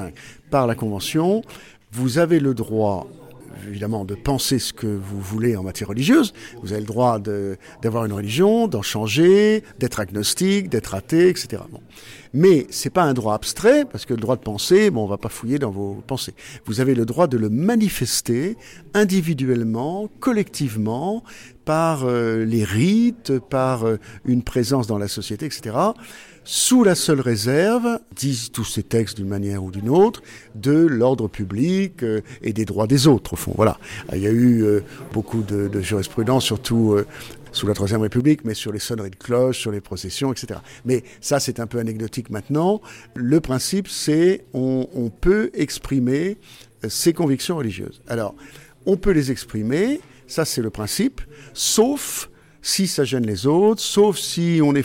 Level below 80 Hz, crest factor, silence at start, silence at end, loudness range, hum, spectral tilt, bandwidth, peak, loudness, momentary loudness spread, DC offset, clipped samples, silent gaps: -44 dBFS; 16 dB; 0 s; 0 s; 4 LU; none; -5 dB/octave; 17 kHz; -4 dBFS; -20 LUFS; 12 LU; under 0.1%; under 0.1%; none